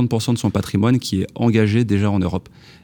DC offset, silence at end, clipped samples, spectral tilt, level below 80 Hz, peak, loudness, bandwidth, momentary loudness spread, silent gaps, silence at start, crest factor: under 0.1%; 0.45 s; under 0.1%; -6.5 dB/octave; -46 dBFS; -2 dBFS; -19 LUFS; 19.5 kHz; 6 LU; none; 0 s; 16 dB